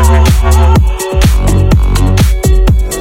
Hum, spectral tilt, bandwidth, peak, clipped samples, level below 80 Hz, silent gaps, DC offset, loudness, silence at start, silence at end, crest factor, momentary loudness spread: none; -6 dB/octave; 16.5 kHz; 0 dBFS; 0.3%; -8 dBFS; none; under 0.1%; -9 LUFS; 0 s; 0 s; 6 dB; 3 LU